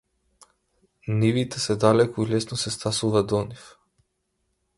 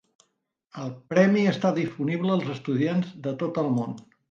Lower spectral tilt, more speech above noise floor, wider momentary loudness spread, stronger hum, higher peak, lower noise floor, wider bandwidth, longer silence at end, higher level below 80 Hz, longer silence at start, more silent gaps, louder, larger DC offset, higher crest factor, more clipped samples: second, -5.5 dB/octave vs -7.5 dB/octave; about the same, 52 dB vs 50 dB; second, 11 LU vs 16 LU; neither; about the same, -4 dBFS vs -6 dBFS; about the same, -74 dBFS vs -75 dBFS; first, 11.5 kHz vs 7.4 kHz; first, 1.1 s vs 0.3 s; first, -54 dBFS vs -70 dBFS; first, 1.05 s vs 0.75 s; neither; about the same, -23 LUFS vs -25 LUFS; neither; about the same, 22 dB vs 20 dB; neither